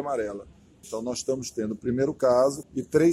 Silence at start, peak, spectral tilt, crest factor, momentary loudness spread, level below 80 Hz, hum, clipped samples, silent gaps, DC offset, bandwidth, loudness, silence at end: 0 s; -8 dBFS; -5.5 dB/octave; 18 dB; 12 LU; -58 dBFS; none; under 0.1%; none; under 0.1%; 14 kHz; -27 LUFS; 0 s